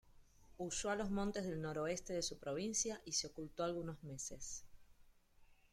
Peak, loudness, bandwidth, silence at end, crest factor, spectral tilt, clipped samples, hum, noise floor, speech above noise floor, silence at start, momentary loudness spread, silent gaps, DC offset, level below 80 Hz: -24 dBFS; -43 LUFS; 16 kHz; 0.2 s; 20 dB; -3.5 dB/octave; under 0.1%; none; -67 dBFS; 25 dB; 0.05 s; 9 LU; none; under 0.1%; -62 dBFS